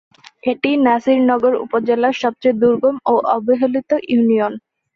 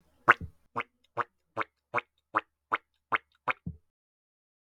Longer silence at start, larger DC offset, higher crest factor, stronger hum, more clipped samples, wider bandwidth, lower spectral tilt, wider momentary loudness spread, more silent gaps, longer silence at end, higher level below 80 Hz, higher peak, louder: first, 0.45 s vs 0.25 s; neither; second, 14 dB vs 30 dB; neither; neither; second, 6.8 kHz vs 12.5 kHz; first, -6.5 dB/octave vs -5 dB/octave; second, 5 LU vs 14 LU; neither; second, 0.4 s vs 0.9 s; about the same, -60 dBFS vs -60 dBFS; about the same, -2 dBFS vs -4 dBFS; first, -16 LUFS vs -32 LUFS